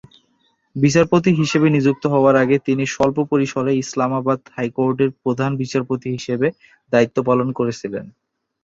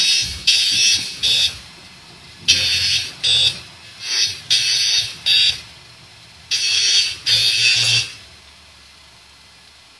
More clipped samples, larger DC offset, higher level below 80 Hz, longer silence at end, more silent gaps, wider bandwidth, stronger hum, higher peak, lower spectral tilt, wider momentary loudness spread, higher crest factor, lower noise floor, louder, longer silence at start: neither; neither; about the same, -56 dBFS vs -52 dBFS; second, 0.55 s vs 1.75 s; neither; second, 7.8 kHz vs 12 kHz; neither; about the same, 0 dBFS vs 0 dBFS; first, -6.5 dB/octave vs 1 dB/octave; about the same, 9 LU vs 9 LU; about the same, 18 dB vs 20 dB; first, -64 dBFS vs -46 dBFS; second, -18 LUFS vs -15 LUFS; first, 0.75 s vs 0 s